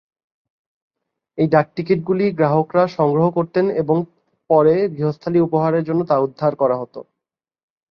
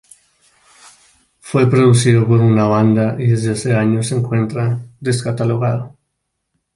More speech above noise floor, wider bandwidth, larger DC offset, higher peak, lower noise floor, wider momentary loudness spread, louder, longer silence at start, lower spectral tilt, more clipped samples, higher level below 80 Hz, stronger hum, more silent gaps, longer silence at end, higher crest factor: first, 68 dB vs 59 dB; second, 6.2 kHz vs 11.5 kHz; neither; about the same, -2 dBFS vs -2 dBFS; first, -85 dBFS vs -73 dBFS; second, 6 LU vs 9 LU; second, -18 LUFS vs -15 LUFS; about the same, 1.35 s vs 1.45 s; first, -10 dB/octave vs -7 dB/octave; neither; second, -60 dBFS vs -50 dBFS; neither; neither; about the same, 0.9 s vs 0.9 s; about the same, 16 dB vs 14 dB